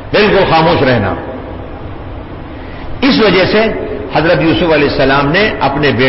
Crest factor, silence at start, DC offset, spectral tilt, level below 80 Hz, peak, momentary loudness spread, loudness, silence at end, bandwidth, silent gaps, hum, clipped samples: 10 dB; 0 s; under 0.1%; -9.5 dB/octave; -28 dBFS; 0 dBFS; 18 LU; -10 LUFS; 0 s; 5.8 kHz; none; none; under 0.1%